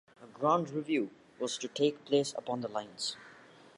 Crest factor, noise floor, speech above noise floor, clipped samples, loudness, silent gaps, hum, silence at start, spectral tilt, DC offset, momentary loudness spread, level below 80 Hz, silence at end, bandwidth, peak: 20 dB; -57 dBFS; 24 dB; under 0.1%; -34 LUFS; none; none; 0.2 s; -4.5 dB/octave; under 0.1%; 9 LU; -82 dBFS; 0.4 s; 11.5 kHz; -14 dBFS